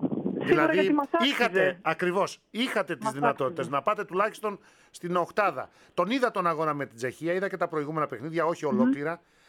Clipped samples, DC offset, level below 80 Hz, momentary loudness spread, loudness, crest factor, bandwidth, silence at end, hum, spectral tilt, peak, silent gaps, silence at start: under 0.1%; under 0.1%; -72 dBFS; 9 LU; -27 LUFS; 18 dB; 17 kHz; 0.3 s; none; -5.5 dB/octave; -10 dBFS; none; 0 s